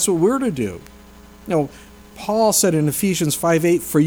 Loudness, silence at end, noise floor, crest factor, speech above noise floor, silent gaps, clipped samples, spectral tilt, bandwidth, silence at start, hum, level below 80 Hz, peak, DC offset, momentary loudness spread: -19 LUFS; 0 s; -43 dBFS; 14 dB; 25 dB; none; under 0.1%; -4.5 dB/octave; over 20 kHz; 0 s; none; -48 dBFS; -4 dBFS; under 0.1%; 13 LU